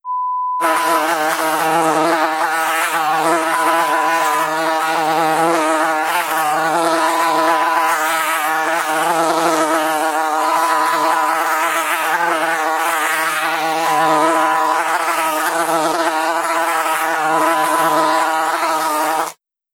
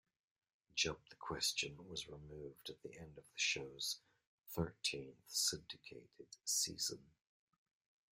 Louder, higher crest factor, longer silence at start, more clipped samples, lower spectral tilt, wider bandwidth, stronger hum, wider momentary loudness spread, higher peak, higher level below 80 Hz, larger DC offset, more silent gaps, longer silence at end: first, -16 LUFS vs -41 LUFS; second, 16 dB vs 22 dB; second, 0.05 s vs 0.75 s; neither; about the same, -2 dB/octave vs -1.5 dB/octave; about the same, 17.5 kHz vs 16 kHz; neither; second, 2 LU vs 16 LU; first, -2 dBFS vs -24 dBFS; about the same, -74 dBFS vs -70 dBFS; neither; second, none vs 4.27-4.38 s; second, 0.4 s vs 1.1 s